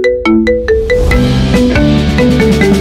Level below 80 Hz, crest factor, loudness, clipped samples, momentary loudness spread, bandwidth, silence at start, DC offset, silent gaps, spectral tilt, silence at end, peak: -18 dBFS; 8 dB; -10 LUFS; under 0.1%; 2 LU; 15.5 kHz; 0 s; under 0.1%; none; -6.5 dB/octave; 0 s; 0 dBFS